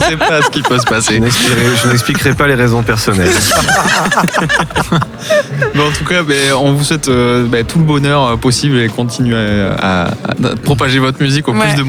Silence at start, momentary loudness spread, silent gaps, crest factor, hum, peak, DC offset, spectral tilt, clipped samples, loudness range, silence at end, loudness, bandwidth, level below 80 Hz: 0 s; 4 LU; none; 12 dB; none; 0 dBFS; under 0.1%; -4.5 dB/octave; under 0.1%; 2 LU; 0 s; -11 LUFS; 19.5 kHz; -32 dBFS